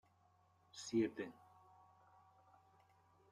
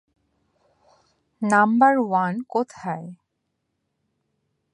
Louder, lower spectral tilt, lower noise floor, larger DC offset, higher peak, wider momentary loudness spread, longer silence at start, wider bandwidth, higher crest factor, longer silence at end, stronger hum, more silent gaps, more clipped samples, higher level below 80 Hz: second, -43 LUFS vs -21 LUFS; second, -5 dB/octave vs -6.5 dB/octave; about the same, -74 dBFS vs -77 dBFS; neither; second, -28 dBFS vs -4 dBFS; first, 20 LU vs 15 LU; second, 0.75 s vs 1.4 s; about the same, 11.5 kHz vs 11 kHz; about the same, 22 dB vs 20 dB; first, 2 s vs 1.6 s; neither; neither; neither; second, -88 dBFS vs -72 dBFS